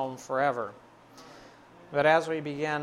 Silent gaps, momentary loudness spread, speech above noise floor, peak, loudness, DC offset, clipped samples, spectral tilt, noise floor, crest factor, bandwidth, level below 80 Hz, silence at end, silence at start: none; 14 LU; 25 dB; -10 dBFS; -28 LUFS; under 0.1%; under 0.1%; -5.5 dB/octave; -53 dBFS; 20 dB; 13.5 kHz; -70 dBFS; 0 s; 0 s